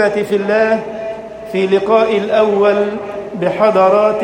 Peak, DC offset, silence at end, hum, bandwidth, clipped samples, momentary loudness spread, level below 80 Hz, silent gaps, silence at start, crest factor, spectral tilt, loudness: 0 dBFS; under 0.1%; 0 s; none; 16 kHz; under 0.1%; 13 LU; -52 dBFS; none; 0 s; 12 dB; -6.5 dB/octave; -14 LUFS